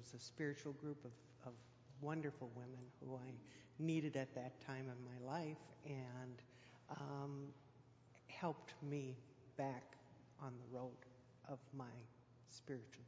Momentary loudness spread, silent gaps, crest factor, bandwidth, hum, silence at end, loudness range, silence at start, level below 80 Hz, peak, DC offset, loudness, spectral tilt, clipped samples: 18 LU; none; 20 dB; 7.8 kHz; none; 0 s; 5 LU; 0 s; -84 dBFS; -30 dBFS; under 0.1%; -51 LUFS; -6.5 dB/octave; under 0.1%